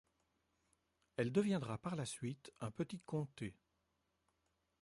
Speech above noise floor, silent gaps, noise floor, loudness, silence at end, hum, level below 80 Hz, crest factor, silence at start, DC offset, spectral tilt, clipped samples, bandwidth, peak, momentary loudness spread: 43 dB; none; -84 dBFS; -43 LUFS; 1.3 s; none; -74 dBFS; 20 dB; 1.2 s; under 0.1%; -6 dB/octave; under 0.1%; 11.5 kHz; -24 dBFS; 13 LU